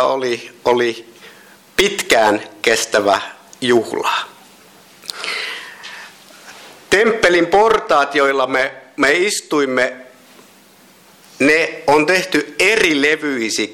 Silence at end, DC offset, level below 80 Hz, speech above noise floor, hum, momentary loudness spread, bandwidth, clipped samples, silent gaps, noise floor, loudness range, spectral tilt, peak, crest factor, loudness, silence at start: 0 s; under 0.1%; -52 dBFS; 32 dB; none; 14 LU; 17.5 kHz; under 0.1%; none; -47 dBFS; 7 LU; -2.5 dB/octave; -2 dBFS; 14 dB; -15 LUFS; 0 s